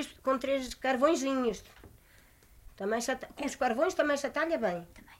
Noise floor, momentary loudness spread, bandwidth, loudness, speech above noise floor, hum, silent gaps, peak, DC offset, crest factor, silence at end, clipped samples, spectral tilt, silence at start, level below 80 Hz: -60 dBFS; 9 LU; 16 kHz; -31 LUFS; 29 dB; none; none; -14 dBFS; under 0.1%; 18 dB; 0.05 s; under 0.1%; -3.5 dB/octave; 0 s; -60 dBFS